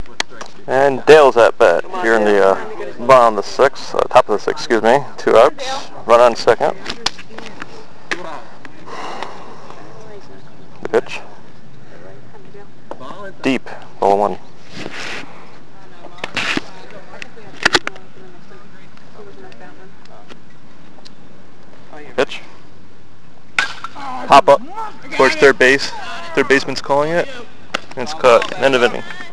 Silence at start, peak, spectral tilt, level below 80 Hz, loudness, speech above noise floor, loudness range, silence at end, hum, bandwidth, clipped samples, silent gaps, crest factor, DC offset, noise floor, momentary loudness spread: 0 s; 0 dBFS; -4 dB/octave; -52 dBFS; -15 LUFS; 33 dB; 15 LU; 0.05 s; none; 11 kHz; 0.1%; none; 18 dB; 6%; -46 dBFS; 23 LU